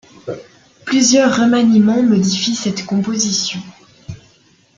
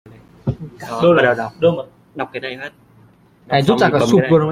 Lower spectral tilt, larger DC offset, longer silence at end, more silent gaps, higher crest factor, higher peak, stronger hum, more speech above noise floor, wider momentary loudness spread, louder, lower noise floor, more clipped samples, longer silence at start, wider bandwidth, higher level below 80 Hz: second, -4 dB/octave vs -6.5 dB/octave; neither; first, 0.6 s vs 0 s; neither; about the same, 14 dB vs 16 dB; about the same, -2 dBFS vs -2 dBFS; neither; first, 38 dB vs 34 dB; first, 21 LU vs 16 LU; about the same, -14 LUFS vs -16 LUFS; about the same, -52 dBFS vs -49 dBFS; neither; second, 0.25 s vs 0.45 s; second, 9.2 kHz vs 14.5 kHz; second, -54 dBFS vs -48 dBFS